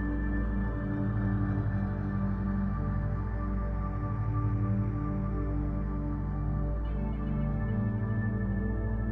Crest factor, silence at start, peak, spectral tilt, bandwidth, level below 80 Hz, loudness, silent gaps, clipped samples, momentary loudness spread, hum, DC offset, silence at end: 12 dB; 0 s; -18 dBFS; -11.5 dB/octave; 3.1 kHz; -34 dBFS; -32 LUFS; none; under 0.1%; 3 LU; 50 Hz at -60 dBFS; under 0.1%; 0 s